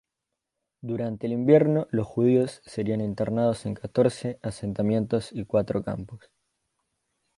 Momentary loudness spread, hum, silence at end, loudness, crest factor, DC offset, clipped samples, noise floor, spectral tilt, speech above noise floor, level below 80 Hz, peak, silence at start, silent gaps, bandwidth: 13 LU; none; 1.2 s; -26 LUFS; 20 dB; under 0.1%; under 0.1%; -85 dBFS; -8 dB/octave; 60 dB; -56 dBFS; -6 dBFS; 0.85 s; none; 11.5 kHz